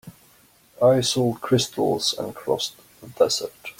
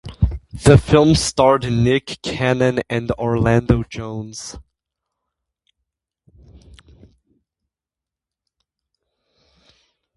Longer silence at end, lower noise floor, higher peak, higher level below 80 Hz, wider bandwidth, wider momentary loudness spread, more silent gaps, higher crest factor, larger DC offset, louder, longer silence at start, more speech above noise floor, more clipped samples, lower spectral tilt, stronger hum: second, 0.1 s vs 5.55 s; second, -56 dBFS vs -88 dBFS; second, -6 dBFS vs 0 dBFS; second, -60 dBFS vs -34 dBFS; first, 16.5 kHz vs 11.5 kHz; second, 8 LU vs 16 LU; neither; about the same, 18 dB vs 20 dB; neither; second, -22 LUFS vs -17 LUFS; about the same, 0.05 s vs 0.05 s; second, 34 dB vs 72 dB; neither; second, -4.5 dB/octave vs -6 dB/octave; neither